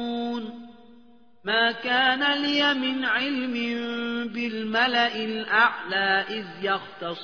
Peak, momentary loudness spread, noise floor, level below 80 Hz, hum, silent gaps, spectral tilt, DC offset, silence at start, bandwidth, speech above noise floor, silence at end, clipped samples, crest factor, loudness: -8 dBFS; 10 LU; -56 dBFS; -70 dBFS; none; none; -4 dB/octave; 0.2%; 0 s; 5.4 kHz; 31 dB; 0 s; under 0.1%; 18 dB; -24 LUFS